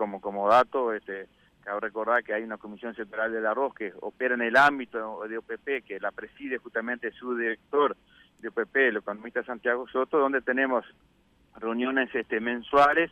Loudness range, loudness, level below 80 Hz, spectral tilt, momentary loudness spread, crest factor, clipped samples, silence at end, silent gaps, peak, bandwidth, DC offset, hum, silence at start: 4 LU; -27 LUFS; -66 dBFS; -5 dB/octave; 15 LU; 18 dB; under 0.1%; 0.05 s; none; -10 dBFS; 12.5 kHz; under 0.1%; none; 0 s